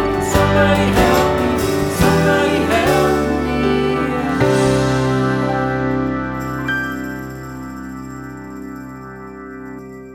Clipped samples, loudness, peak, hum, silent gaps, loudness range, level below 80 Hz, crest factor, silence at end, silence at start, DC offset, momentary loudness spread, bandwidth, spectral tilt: under 0.1%; -16 LUFS; 0 dBFS; none; none; 11 LU; -32 dBFS; 16 dB; 0 s; 0 s; under 0.1%; 18 LU; 20 kHz; -5.5 dB/octave